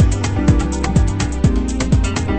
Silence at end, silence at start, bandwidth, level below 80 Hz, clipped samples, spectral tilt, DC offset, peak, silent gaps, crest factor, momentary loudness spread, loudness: 0 s; 0 s; 8.8 kHz; -20 dBFS; under 0.1%; -6 dB/octave; under 0.1%; 0 dBFS; none; 14 dB; 2 LU; -17 LUFS